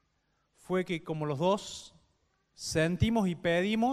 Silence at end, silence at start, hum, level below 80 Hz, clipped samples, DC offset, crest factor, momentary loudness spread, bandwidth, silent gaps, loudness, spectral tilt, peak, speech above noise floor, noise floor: 0 s; 0.7 s; none; -52 dBFS; under 0.1%; under 0.1%; 18 dB; 10 LU; 14 kHz; none; -31 LUFS; -5.5 dB/octave; -14 dBFS; 46 dB; -76 dBFS